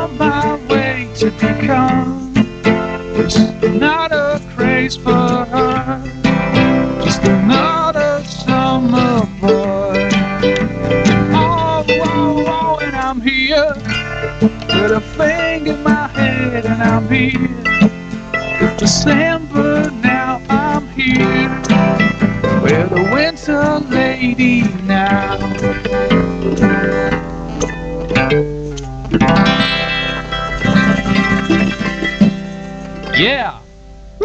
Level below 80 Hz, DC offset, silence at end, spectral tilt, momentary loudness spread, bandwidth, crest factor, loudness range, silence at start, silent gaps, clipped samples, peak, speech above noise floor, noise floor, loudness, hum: -32 dBFS; under 0.1%; 0 s; -5.5 dB/octave; 6 LU; 8.4 kHz; 14 dB; 2 LU; 0 s; none; under 0.1%; 0 dBFS; 22 dB; -36 dBFS; -14 LUFS; none